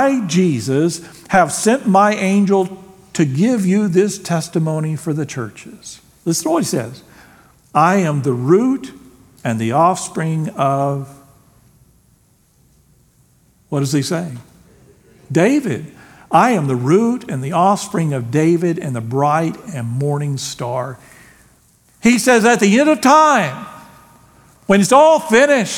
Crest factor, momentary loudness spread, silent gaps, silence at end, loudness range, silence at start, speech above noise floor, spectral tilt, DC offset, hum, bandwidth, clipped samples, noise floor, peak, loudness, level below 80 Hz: 16 dB; 15 LU; none; 0 s; 9 LU; 0 s; 40 dB; -5.5 dB/octave; under 0.1%; none; 18 kHz; under 0.1%; -55 dBFS; 0 dBFS; -16 LUFS; -56 dBFS